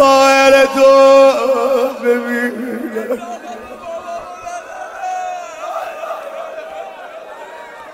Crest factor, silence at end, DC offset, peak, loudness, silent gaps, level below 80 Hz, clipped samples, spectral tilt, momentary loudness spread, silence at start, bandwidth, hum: 14 dB; 0 s; under 0.1%; 0 dBFS; -12 LUFS; none; -56 dBFS; under 0.1%; -2.5 dB/octave; 22 LU; 0 s; 16 kHz; none